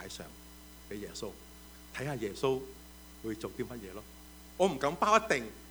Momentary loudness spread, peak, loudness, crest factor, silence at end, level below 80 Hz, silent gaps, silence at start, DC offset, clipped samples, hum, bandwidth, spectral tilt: 24 LU; -8 dBFS; -34 LUFS; 26 dB; 0 s; -56 dBFS; none; 0 s; under 0.1%; under 0.1%; none; over 20 kHz; -4.5 dB/octave